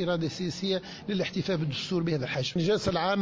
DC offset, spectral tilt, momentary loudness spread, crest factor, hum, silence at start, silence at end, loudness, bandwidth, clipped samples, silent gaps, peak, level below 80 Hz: under 0.1%; -5.5 dB/octave; 5 LU; 14 dB; none; 0 s; 0 s; -29 LUFS; 7.8 kHz; under 0.1%; none; -14 dBFS; -56 dBFS